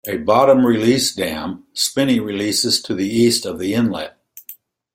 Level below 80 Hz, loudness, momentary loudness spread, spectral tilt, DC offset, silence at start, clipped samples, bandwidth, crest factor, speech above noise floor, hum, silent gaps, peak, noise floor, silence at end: -54 dBFS; -17 LUFS; 14 LU; -4 dB/octave; under 0.1%; 0.05 s; under 0.1%; 16.5 kHz; 16 dB; 25 dB; none; none; -2 dBFS; -42 dBFS; 0.4 s